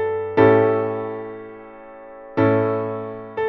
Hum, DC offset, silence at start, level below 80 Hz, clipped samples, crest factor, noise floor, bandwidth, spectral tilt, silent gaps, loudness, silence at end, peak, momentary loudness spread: none; under 0.1%; 0 s; -56 dBFS; under 0.1%; 18 dB; -40 dBFS; 4.8 kHz; -10 dB/octave; none; -20 LUFS; 0 s; -2 dBFS; 25 LU